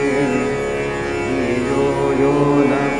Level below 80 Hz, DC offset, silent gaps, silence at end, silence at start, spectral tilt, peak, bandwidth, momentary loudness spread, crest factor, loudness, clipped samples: -38 dBFS; under 0.1%; none; 0 s; 0 s; -6.5 dB/octave; -2 dBFS; 10.5 kHz; 6 LU; 14 dB; -18 LUFS; under 0.1%